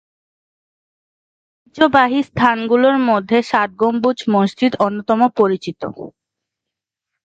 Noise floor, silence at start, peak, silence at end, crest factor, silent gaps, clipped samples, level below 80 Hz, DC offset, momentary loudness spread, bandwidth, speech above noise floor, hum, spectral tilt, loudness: -83 dBFS; 1.75 s; 0 dBFS; 1.15 s; 18 dB; none; under 0.1%; -56 dBFS; under 0.1%; 12 LU; 8 kHz; 68 dB; none; -6.5 dB/octave; -16 LUFS